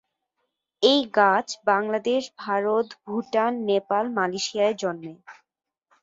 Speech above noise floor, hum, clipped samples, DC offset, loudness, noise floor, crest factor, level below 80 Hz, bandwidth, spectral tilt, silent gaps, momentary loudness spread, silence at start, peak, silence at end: 60 dB; none; under 0.1%; under 0.1%; -24 LUFS; -83 dBFS; 20 dB; -74 dBFS; 7.8 kHz; -3.5 dB/octave; none; 10 LU; 0.8 s; -4 dBFS; 0.7 s